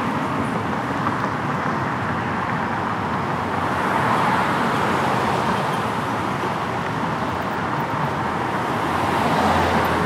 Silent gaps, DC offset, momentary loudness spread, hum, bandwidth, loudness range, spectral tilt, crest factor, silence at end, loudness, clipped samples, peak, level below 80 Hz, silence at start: none; under 0.1%; 5 LU; none; 16 kHz; 2 LU; -5.5 dB/octave; 16 dB; 0 s; -22 LUFS; under 0.1%; -6 dBFS; -46 dBFS; 0 s